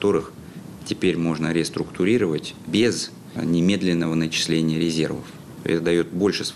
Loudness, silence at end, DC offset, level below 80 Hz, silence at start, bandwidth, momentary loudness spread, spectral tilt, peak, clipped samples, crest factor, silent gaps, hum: -22 LUFS; 0 s; under 0.1%; -54 dBFS; 0 s; 13.5 kHz; 11 LU; -5 dB/octave; -8 dBFS; under 0.1%; 14 dB; none; none